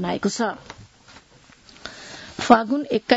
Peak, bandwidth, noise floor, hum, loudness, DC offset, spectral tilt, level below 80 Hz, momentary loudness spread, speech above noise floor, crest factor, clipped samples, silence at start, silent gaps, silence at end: 0 dBFS; 8 kHz; -52 dBFS; none; -21 LUFS; under 0.1%; -4.5 dB/octave; -56 dBFS; 23 LU; 32 dB; 24 dB; under 0.1%; 0 s; none; 0 s